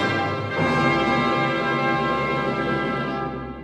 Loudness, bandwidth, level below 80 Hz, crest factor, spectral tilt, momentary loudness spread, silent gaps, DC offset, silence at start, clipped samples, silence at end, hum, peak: -22 LUFS; 12 kHz; -46 dBFS; 16 dB; -6.5 dB/octave; 6 LU; none; under 0.1%; 0 s; under 0.1%; 0 s; none; -6 dBFS